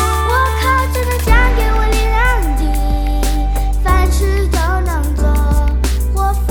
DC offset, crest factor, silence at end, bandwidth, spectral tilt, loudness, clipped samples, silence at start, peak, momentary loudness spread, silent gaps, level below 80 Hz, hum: under 0.1%; 12 dB; 0 s; 18 kHz; -5.5 dB/octave; -15 LUFS; under 0.1%; 0 s; 0 dBFS; 4 LU; none; -14 dBFS; none